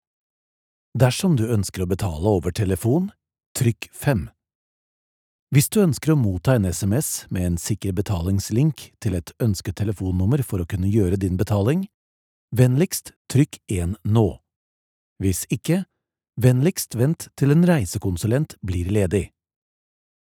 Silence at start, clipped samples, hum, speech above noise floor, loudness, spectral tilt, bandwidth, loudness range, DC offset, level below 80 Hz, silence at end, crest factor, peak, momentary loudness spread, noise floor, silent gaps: 0.95 s; under 0.1%; none; over 69 dB; -22 LUFS; -6.5 dB/octave; 18 kHz; 3 LU; under 0.1%; -44 dBFS; 1.05 s; 20 dB; -2 dBFS; 8 LU; under -90 dBFS; 3.46-3.55 s, 4.55-5.47 s, 11.94-12.48 s, 13.16-13.25 s, 14.56-15.16 s